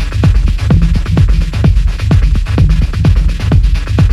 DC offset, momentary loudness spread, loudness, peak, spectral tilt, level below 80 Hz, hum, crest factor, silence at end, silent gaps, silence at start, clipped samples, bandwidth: under 0.1%; 2 LU; -12 LUFS; 0 dBFS; -7.5 dB/octave; -12 dBFS; none; 8 dB; 0 s; none; 0 s; under 0.1%; 10.5 kHz